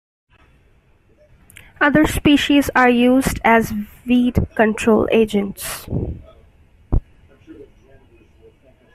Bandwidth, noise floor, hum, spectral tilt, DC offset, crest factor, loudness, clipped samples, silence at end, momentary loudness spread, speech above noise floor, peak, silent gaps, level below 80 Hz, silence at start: 15 kHz; -54 dBFS; none; -5.5 dB/octave; under 0.1%; 16 dB; -17 LUFS; under 0.1%; 1.3 s; 12 LU; 38 dB; -2 dBFS; none; -34 dBFS; 1.8 s